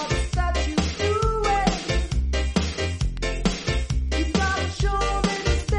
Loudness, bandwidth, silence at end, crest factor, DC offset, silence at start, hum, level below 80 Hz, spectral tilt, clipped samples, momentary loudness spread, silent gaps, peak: -24 LUFS; 11 kHz; 0 s; 16 dB; under 0.1%; 0 s; none; -26 dBFS; -5 dB/octave; under 0.1%; 4 LU; none; -6 dBFS